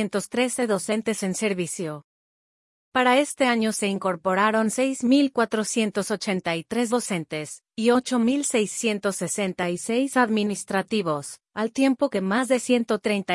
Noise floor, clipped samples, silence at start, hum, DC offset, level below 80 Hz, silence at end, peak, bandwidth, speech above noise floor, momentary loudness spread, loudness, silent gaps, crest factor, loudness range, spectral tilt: under -90 dBFS; under 0.1%; 0 s; none; under 0.1%; -70 dBFS; 0 s; -6 dBFS; 12 kHz; over 66 dB; 8 LU; -24 LUFS; 2.04-2.92 s; 18 dB; 2 LU; -4 dB/octave